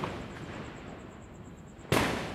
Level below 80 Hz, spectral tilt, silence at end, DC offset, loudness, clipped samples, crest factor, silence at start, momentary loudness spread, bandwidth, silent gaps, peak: -52 dBFS; -4.5 dB/octave; 0 s; under 0.1%; -34 LUFS; under 0.1%; 22 dB; 0 s; 20 LU; 16 kHz; none; -14 dBFS